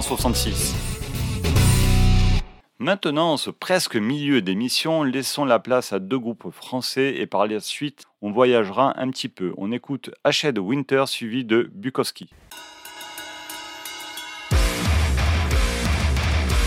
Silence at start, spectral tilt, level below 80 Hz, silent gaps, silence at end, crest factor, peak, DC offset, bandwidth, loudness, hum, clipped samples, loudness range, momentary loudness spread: 0 s; -5 dB/octave; -28 dBFS; none; 0 s; 18 dB; -4 dBFS; under 0.1%; 17.5 kHz; -22 LUFS; none; under 0.1%; 5 LU; 14 LU